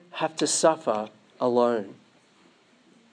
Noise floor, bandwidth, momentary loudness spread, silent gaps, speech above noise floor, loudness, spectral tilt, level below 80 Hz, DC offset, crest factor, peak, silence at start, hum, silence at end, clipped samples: -59 dBFS; 10.5 kHz; 11 LU; none; 35 dB; -25 LUFS; -3 dB/octave; -86 dBFS; under 0.1%; 20 dB; -8 dBFS; 0.15 s; none; 1.2 s; under 0.1%